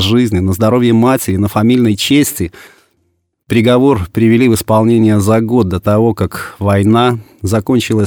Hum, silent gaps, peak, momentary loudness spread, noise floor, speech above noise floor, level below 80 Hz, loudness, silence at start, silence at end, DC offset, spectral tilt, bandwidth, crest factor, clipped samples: none; none; 0 dBFS; 7 LU; -62 dBFS; 52 dB; -40 dBFS; -12 LUFS; 0 s; 0 s; under 0.1%; -6 dB/octave; 18.5 kHz; 10 dB; under 0.1%